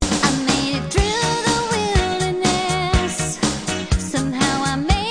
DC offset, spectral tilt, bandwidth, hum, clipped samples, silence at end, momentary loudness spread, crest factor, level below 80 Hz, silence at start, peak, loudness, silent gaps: under 0.1%; -4 dB/octave; 10.5 kHz; none; under 0.1%; 0 s; 4 LU; 16 dB; -28 dBFS; 0 s; -2 dBFS; -19 LUFS; none